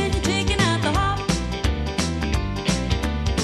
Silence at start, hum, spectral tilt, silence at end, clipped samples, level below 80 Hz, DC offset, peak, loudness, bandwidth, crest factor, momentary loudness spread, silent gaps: 0 s; none; -4.5 dB/octave; 0 s; under 0.1%; -28 dBFS; under 0.1%; -4 dBFS; -23 LUFS; 13.5 kHz; 18 dB; 5 LU; none